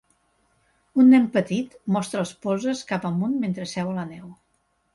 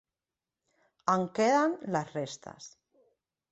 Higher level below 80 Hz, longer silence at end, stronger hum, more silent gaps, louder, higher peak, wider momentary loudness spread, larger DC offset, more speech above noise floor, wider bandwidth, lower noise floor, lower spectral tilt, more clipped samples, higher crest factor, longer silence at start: first, -64 dBFS vs -74 dBFS; second, 0.6 s vs 0.85 s; neither; neither; first, -23 LUFS vs -30 LUFS; first, -8 dBFS vs -12 dBFS; second, 13 LU vs 22 LU; neither; second, 47 dB vs over 60 dB; first, 11.5 kHz vs 8.4 kHz; second, -69 dBFS vs under -90 dBFS; first, -6.5 dB/octave vs -5 dB/octave; neither; about the same, 16 dB vs 20 dB; about the same, 0.95 s vs 1.05 s